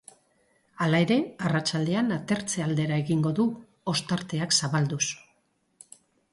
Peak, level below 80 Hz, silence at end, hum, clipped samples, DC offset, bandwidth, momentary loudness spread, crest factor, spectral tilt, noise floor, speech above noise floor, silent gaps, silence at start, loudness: -8 dBFS; -66 dBFS; 1.15 s; none; under 0.1%; under 0.1%; 11.5 kHz; 6 LU; 18 dB; -4.5 dB/octave; -70 dBFS; 44 dB; none; 0.8 s; -26 LUFS